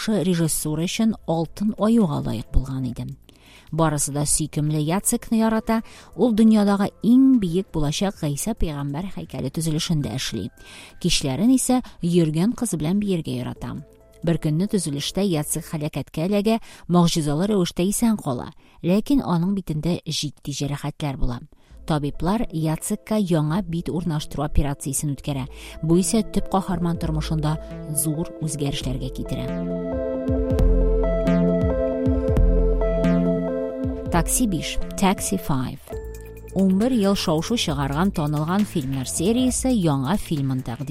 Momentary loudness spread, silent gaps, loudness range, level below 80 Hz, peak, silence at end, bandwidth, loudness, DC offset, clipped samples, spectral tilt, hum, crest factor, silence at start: 10 LU; none; 5 LU; -32 dBFS; -4 dBFS; 0 s; 16 kHz; -23 LUFS; under 0.1%; under 0.1%; -5.5 dB/octave; none; 16 dB; 0 s